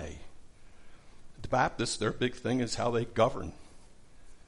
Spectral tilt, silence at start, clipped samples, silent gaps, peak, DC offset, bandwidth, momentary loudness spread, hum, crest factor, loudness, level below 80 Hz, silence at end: -5 dB/octave; 0 s; under 0.1%; none; -12 dBFS; under 0.1%; 11.5 kHz; 16 LU; none; 22 dB; -31 LUFS; -52 dBFS; 0.05 s